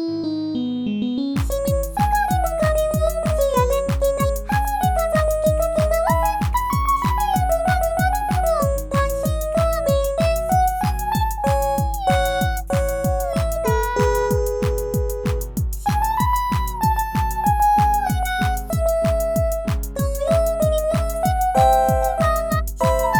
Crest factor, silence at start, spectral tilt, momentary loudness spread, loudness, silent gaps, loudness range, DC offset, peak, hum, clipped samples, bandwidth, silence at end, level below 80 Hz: 14 dB; 0 s; -6 dB/octave; 5 LU; -20 LUFS; none; 2 LU; under 0.1%; -4 dBFS; none; under 0.1%; over 20 kHz; 0 s; -26 dBFS